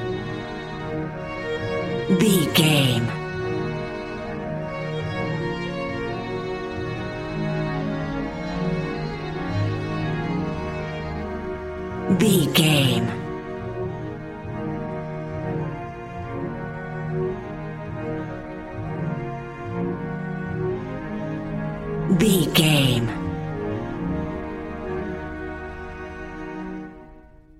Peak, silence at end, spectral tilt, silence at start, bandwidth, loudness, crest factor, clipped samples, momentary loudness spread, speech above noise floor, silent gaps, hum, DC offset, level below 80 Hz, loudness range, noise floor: -4 dBFS; 0.05 s; -5.5 dB/octave; 0 s; 16 kHz; -25 LUFS; 22 dB; under 0.1%; 15 LU; 28 dB; none; none; under 0.1%; -42 dBFS; 9 LU; -47 dBFS